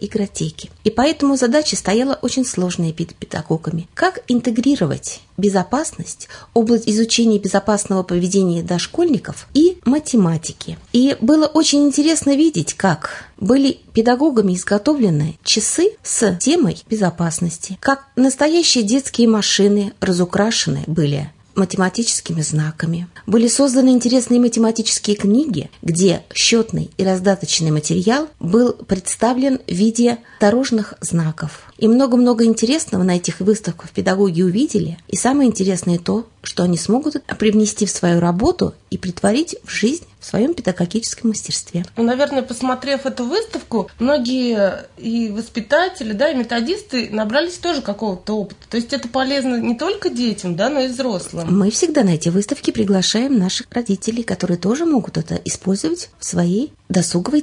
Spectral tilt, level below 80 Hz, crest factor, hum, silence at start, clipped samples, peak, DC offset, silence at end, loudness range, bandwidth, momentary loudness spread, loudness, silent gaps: -4.5 dB/octave; -48 dBFS; 16 dB; none; 0 s; under 0.1%; -2 dBFS; under 0.1%; 0 s; 4 LU; 11 kHz; 9 LU; -17 LUFS; none